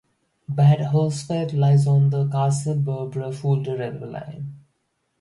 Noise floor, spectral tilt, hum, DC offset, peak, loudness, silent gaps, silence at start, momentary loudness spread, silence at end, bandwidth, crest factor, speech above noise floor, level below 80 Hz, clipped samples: -72 dBFS; -8 dB/octave; none; under 0.1%; -6 dBFS; -21 LUFS; none; 0.5 s; 16 LU; 0.6 s; 11 kHz; 14 dB; 51 dB; -62 dBFS; under 0.1%